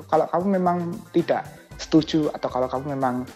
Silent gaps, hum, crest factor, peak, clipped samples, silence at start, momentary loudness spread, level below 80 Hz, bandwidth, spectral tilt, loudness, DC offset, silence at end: none; none; 16 dB; -6 dBFS; under 0.1%; 0 s; 6 LU; -52 dBFS; 13.5 kHz; -6.5 dB/octave; -23 LUFS; under 0.1%; 0 s